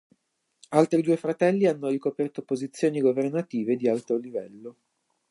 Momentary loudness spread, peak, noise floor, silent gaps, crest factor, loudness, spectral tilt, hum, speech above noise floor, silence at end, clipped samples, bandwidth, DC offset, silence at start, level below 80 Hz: 13 LU; -6 dBFS; -73 dBFS; none; 20 dB; -26 LUFS; -7 dB/octave; none; 48 dB; 0.6 s; under 0.1%; 11.5 kHz; under 0.1%; 0.7 s; -78 dBFS